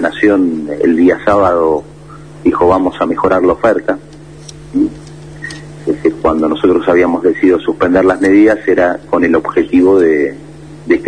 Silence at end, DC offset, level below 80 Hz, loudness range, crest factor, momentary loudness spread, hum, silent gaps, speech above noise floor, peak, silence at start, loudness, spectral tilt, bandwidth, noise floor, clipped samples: 0 s; 0.5%; -40 dBFS; 5 LU; 12 dB; 17 LU; none; none; 22 dB; 0 dBFS; 0 s; -11 LUFS; -7 dB/octave; 10 kHz; -33 dBFS; under 0.1%